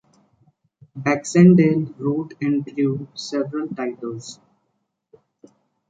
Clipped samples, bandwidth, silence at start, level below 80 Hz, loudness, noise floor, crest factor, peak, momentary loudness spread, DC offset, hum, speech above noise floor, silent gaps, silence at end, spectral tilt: under 0.1%; 9.2 kHz; 0.95 s; -64 dBFS; -20 LUFS; -73 dBFS; 20 dB; -2 dBFS; 19 LU; under 0.1%; none; 54 dB; none; 1.55 s; -7 dB/octave